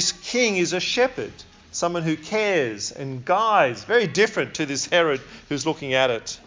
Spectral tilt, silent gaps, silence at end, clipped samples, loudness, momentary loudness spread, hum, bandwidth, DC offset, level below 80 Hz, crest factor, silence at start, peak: -3 dB/octave; none; 0.05 s; under 0.1%; -22 LUFS; 10 LU; none; 7.8 kHz; under 0.1%; -58 dBFS; 18 dB; 0 s; -6 dBFS